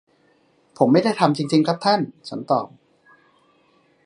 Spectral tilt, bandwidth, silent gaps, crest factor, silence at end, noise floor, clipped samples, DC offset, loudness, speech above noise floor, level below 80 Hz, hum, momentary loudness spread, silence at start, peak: -6.5 dB/octave; 11 kHz; none; 22 dB; 1.4 s; -60 dBFS; under 0.1%; under 0.1%; -20 LUFS; 41 dB; -72 dBFS; none; 12 LU; 0.8 s; 0 dBFS